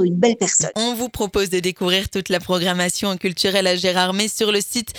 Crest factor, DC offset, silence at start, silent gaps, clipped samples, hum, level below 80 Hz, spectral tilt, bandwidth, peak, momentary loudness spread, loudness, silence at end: 18 dB; under 0.1%; 0 s; none; under 0.1%; none; -46 dBFS; -3 dB/octave; over 20 kHz; -2 dBFS; 5 LU; -19 LUFS; 0 s